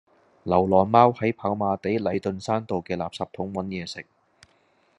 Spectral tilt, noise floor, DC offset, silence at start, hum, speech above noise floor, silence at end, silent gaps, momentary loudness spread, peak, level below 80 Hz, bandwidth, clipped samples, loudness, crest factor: -7 dB/octave; -64 dBFS; under 0.1%; 0.45 s; none; 40 dB; 0.95 s; none; 14 LU; -2 dBFS; -66 dBFS; 11 kHz; under 0.1%; -24 LUFS; 22 dB